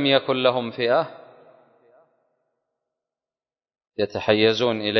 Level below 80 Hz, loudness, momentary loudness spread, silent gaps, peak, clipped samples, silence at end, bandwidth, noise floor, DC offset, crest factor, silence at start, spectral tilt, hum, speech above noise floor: -62 dBFS; -21 LUFS; 10 LU; none; -2 dBFS; under 0.1%; 0 s; 6.4 kHz; under -90 dBFS; under 0.1%; 22 dB; 0 s; -5.5 dB/octave; none; over 69 dB